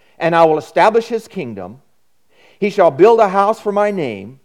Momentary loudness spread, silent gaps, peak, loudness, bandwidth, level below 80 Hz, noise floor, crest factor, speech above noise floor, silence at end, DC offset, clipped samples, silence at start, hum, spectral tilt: 16 LU; none; 0 dBFS; -14 LUFS; 13 kHz; -62 dBFS; -64 dBFS; 16 dB; 50 dB; 0.15 s; 0.2%; under 0.1%; 0.2 s; none; -6 dB/octave